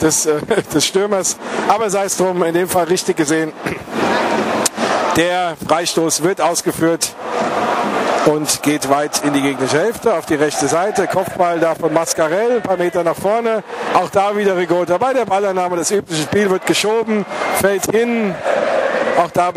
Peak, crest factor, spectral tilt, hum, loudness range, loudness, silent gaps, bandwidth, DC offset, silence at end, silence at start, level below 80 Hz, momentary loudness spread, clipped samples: 0 dBFS; 16 dB; -3.5 dB/octave; none; 1 LU; -16 LUFS; none; 15.5 kHz; under 0.1%; 0 s; 0 s; -52 dBFS; 3 LU; under 0.1%